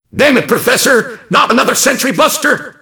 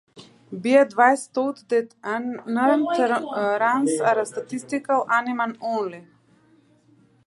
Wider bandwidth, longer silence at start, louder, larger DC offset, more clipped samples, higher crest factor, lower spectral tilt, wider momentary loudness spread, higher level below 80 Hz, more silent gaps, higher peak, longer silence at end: first, 19.5 kHz vs 11.5 kHz; about the same, 0.15 s vs 0.15 s; first, -10 LUFS vs -22 LUFS; neither; first, 0.7% vs under 0.1%; second, 12 dB vs 20 dB; second, -2.5 dB/octave vs -4.5 dB/octave; second, 4 LU vs 11 LU; first, -52 dBFS vs -78 dBFS; neither; about the same, 0 dBFS vs -2 dBFS; second, 0.1 s vs 1.25 s